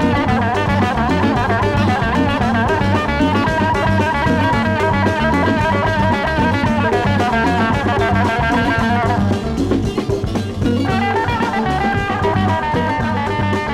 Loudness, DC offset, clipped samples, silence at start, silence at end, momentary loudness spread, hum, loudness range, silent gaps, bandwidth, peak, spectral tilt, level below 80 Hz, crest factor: -16 LUFS; under 0.1%; under 0.1%; 0 s; 0 s; 3 LU; none; 2 LU; none; 12.5 kHz; -2 dBFS; -6.5 dB/octave; -30 dBFS; 14 dB